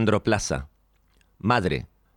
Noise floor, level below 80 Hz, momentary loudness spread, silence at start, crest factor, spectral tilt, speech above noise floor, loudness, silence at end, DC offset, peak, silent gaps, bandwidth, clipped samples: -63 dBFS; -44 dBFS; 9 LU; 0 s; 18 dB; -5 dB/octave; 39 dB; -25 LUFS; 0.3 s; under 0.1%; -8 dBFS; none; 14 kHz; under 0.1%